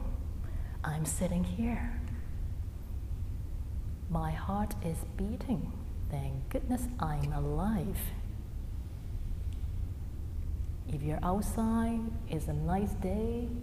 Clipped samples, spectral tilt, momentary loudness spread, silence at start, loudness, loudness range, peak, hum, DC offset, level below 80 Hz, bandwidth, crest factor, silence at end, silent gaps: under 0.1%; -7 dB/octave; 9 LU; 0 s; -36 LUFS; 4 LU; -20 dBFS; none; under 0.1%; -38 dBFS; 15.5 kHz; 14 dB; 0 s; none